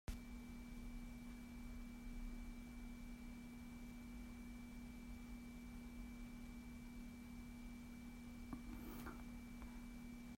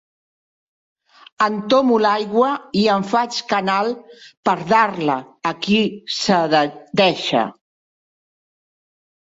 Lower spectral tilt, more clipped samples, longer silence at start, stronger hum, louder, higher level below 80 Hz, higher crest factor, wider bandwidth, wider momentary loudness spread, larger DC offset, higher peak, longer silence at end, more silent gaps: about the same, -5.5 dB/octave vs -5 dB/octave; neither; second, 0.1 s vs 1.4 s; neither; second, -55 LUFS vs -18 LUFS; first, -56 dBFS vs -62 dBFS; about the same, 18 dB vs 18 dB; first, 16 kHz vs 8 kHz; second, 2 LU vs 7 LU; neither; second, -36 dBFS vs -2 dBFS; second, 0 s vs 1.9 s; second, none vs 4.37-4.43 s